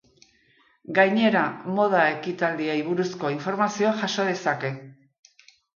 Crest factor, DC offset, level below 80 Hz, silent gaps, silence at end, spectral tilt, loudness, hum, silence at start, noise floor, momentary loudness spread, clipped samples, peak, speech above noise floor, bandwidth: 20 dB; under 0.1%; -74 dBFS; none; 0.85 s; -5 dB/octave; -24 LUFS; none; 0.9 s; -62 dBFS; 7 LU; under 0.1%; -6 dBFS; 39 dB; 7.2 kHz